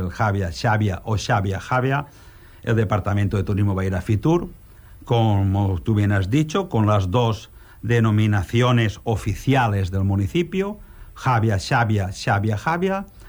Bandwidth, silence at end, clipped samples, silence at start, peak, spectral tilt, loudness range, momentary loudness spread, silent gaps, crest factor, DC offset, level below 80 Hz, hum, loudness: over 20 kHz; 0 s; under 0.1%; 0 s; -8 dBFS; -7 dB/octave; 2 LU; 6 LU; none; 12 dB; under 0.1%; -42 dBFS; none; -21 LUFS